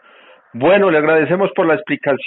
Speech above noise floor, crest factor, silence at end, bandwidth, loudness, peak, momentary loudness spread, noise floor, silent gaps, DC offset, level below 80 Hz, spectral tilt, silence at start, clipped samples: 32 dB; 14 dB; 0 s; 4.1 kHz; -14 LUFS; -2 dBFS; 6 LU; -46 dBFS; none; under 0.1%; -58 dBFS; -4.5 dB/octave; 0.55 s; under 0.1%